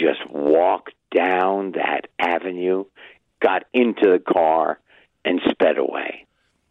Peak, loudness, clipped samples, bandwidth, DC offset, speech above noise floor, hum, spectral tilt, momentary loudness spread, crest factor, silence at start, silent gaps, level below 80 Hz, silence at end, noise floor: -4 dBFS; -20 LUFS; under 0.1%; 5.2 kHz; under 0.1%; 41 dB; none; -7 dB/octave; 10 LU; 16 dB; 0 s; none; -64 dBFS; 0.5 s; -58 dBFS